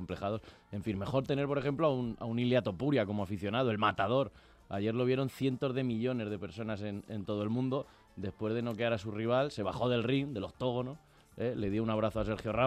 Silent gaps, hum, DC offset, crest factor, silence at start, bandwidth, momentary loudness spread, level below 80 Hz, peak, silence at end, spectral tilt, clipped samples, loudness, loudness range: none; none; under 0.1%; 18 dB; 0 s; 14 kHz; 9 LU; -58 dBFS; -16 dBFS; 0 s; -7.5 dB/octave; under 0.1%; -34 LUFS; 4 LU